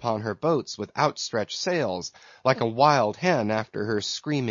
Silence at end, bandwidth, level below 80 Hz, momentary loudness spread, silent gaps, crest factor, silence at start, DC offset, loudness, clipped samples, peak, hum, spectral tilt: 0 s; 7.6 kHz; -68 dBFS; 9 LU; none; 20 dB; 0 s; under 0.1%; -25 LUFS; under 0.1%; -4 dBFS; none; -5 dB/octave